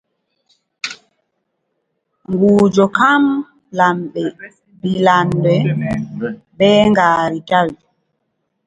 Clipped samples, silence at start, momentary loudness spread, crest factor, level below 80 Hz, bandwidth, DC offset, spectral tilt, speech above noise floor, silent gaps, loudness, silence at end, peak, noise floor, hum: under 0.1%; 0.85 s; 14 LU; 16 dB; -50 dBFS; 9.2 kHz; under 0.1%; -6.5 dB/octave; 57 dB; none; -15 LUFS; 0.9 s; 0 dBFS; -71 dBFS; none